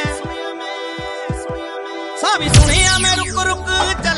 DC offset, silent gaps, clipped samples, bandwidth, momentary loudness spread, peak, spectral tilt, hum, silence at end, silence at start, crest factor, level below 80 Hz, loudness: under 0.1%; none; under 0.1%; 11.5 kHz; 14 LU; 0 dBFS; -3 dB/octave; none; 0 s; 0 s; 16 dB; -24 dBFS; -16 LUFS